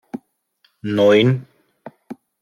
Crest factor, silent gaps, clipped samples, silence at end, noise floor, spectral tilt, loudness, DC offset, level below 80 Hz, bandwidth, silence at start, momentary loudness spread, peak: 18 dB; none; under 0.1%; 0.3 s; -63 dBFS; -7 dB/octave; -16 LUFS; under 0.1%; -64 dBFS; 11.5 kHz; 0.15 s; 25 LU; -4 dBFS